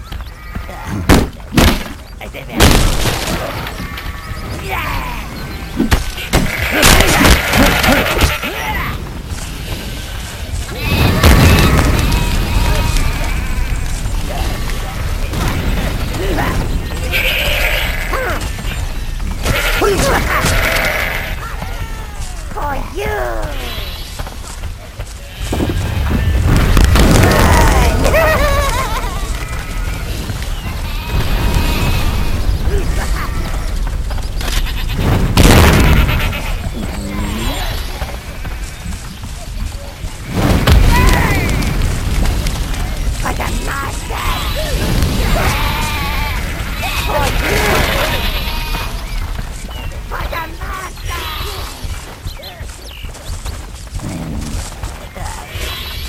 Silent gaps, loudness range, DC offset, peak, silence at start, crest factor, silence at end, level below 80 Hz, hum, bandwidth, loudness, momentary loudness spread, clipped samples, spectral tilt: none; 11 LU; under 0.1%; 0 dBFS; 0 s; 14 dB; 0 s; -18 dBFS; none; 16.5 kHz; -16 LUFS; 16 LU; under 0.1%; -4.5 dB/octave